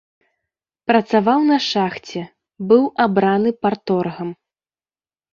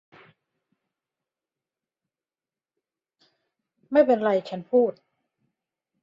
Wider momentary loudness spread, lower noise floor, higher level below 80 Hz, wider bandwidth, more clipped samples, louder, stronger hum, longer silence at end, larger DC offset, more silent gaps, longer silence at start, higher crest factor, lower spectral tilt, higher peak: first, 15 LU vs 7 LU; about the same, under -90 dBFS vs under -90 dBFS; first, -62 dBFS vs -76 dBFS; about the same, 7.4 kHz vs 7.4 kHz; neither; first, -17 LUFS vs -23 LUFS; neither; about the same, 1 s vs 1.1 s; neither; neither; second, 0.9 s vs 3.9 s; about the same, 18 dB vs 22 dB; second, -6 dB/octave vs -7.5 dB/octave; first, -2 dBFS vs -6 dBFS